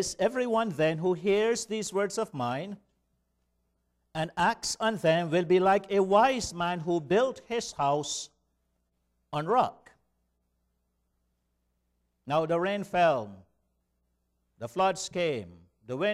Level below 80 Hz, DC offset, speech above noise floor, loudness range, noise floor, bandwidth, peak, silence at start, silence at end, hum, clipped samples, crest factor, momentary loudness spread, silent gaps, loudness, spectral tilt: -62 dBFS; under 0.1%; 49 dB; 9 LU; -77 dBFS; 14.5 kHz; -10 dBFS; 0 s; 0 s; 60 Hz at -65 dBFS; under 0.1%; 20 dB; 12 LU; none; -28 LUFS; -4.5 dB/octave